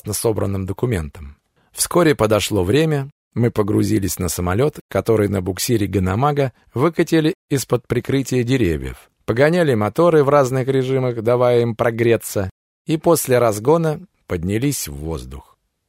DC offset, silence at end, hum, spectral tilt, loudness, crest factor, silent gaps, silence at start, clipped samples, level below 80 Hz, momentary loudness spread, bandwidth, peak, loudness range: under 0.1%; 0.45 s; none; -5.5 dB/octave; -18 LUFS; 16 dB; 3.12-3.31 s, 4.81-4.89 s, 7.35-7.48 s, 12.51-12.85 s; 0.05 s; under 0.1%; -42 dBFS; 10 LU; 16 kHz; -2 dBFS; 3 LU